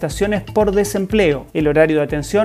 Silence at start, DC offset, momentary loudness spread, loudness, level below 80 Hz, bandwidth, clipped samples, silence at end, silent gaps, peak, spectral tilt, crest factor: 0 s; under 0.1%; 4 LU; -17 LUFS; -34 dBFS; 15.5 kHz; under 0.1%; 0 s; none; -2 dBFS; -5.5 dB/octave; 14 dB